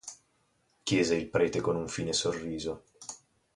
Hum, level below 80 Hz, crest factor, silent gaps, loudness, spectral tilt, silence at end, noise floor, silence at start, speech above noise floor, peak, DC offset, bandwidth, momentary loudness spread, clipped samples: none; -58 dBFS; 20 dB; none; -30 LUFS; -4 dB/octave; 0.4 s; -72 dBFS; 0.05 s; 42 dB; -14 dBFS; under 0.1%; 11.5 kHz; 17 LU; under 0.1%